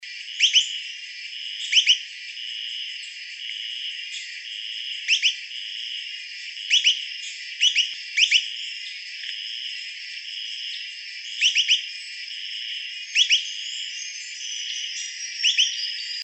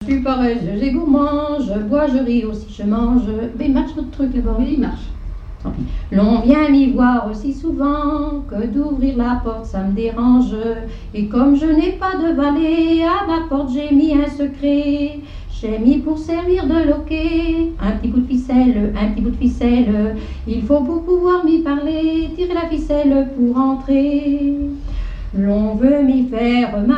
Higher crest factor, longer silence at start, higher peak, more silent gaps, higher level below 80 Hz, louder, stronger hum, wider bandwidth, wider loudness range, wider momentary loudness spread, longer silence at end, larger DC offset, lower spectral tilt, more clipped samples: first, 22 dB vs 16 dB; about the same, 0 s vs 0 s; second, -4 dBFS vs 0 dBFS; neither; second, under -90 dBFS vs -28 dBFS; second, -23 LUFS vs -17 LUFS; neither; first, 8.6 kHz vs 7.2 kHz; about the same, 5 LU vs 3 LU; first, 15 LU vs 10 LU; about the same, 0 s vs 0 s; neither; second, 11 dB/octave vs -8 dB/octave; neither